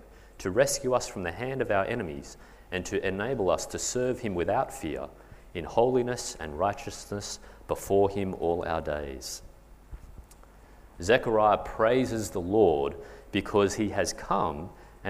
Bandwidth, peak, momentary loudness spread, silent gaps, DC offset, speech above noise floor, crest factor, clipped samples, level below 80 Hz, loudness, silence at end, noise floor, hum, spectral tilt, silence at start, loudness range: 15.5 kHz; -8 dBFS; 14 LU; none; under 0.1%; 24 dB; 22 dB; under 0.1%; -50 dBFS; -28 LUFS; 0 s; -52 dBFS; none; -4.5 dB/octave; 0.05 s; 5 LU